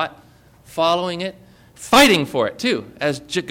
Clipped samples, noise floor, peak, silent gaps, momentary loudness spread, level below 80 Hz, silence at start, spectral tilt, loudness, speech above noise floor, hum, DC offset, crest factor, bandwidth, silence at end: under 0.1%; -49 dBFS; -2 dBFS; none; 17 LU; -52 dBFS; 0 s; -3.5 dB/octave; -18 LUFS; 31 dB; none; under 0.1%; 18 dB; 17 kHz; 0 s